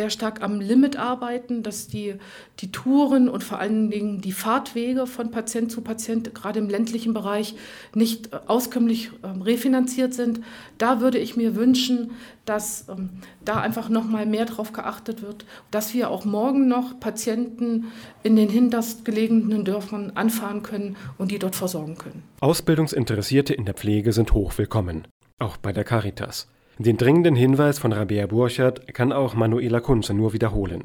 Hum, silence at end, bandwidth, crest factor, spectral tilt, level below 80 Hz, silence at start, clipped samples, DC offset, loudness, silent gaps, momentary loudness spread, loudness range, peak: none; 0 s; 19.5 kHz; 18 dB; -6 dB/octave; -40 dBFS; 0 s; under 0.1%; under 0.1%; -23 LUFS; 25.11-25.21 s, 25.33-25.37 s; 12 LU; 5 LU; -4 dBFS